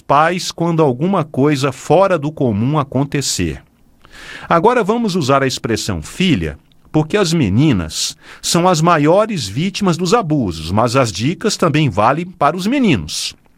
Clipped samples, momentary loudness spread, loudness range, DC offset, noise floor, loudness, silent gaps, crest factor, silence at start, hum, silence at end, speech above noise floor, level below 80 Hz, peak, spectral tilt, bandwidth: under 0.1%; 7 LU; 2 LU; under 0.1%; -46 dBFS; -15 LUFS; none; 16 dB; 0.1 s; none; 0.25 s; 31 dB; -42 dBFS; 0 dBFS; -5 dB/octave; 16 kHz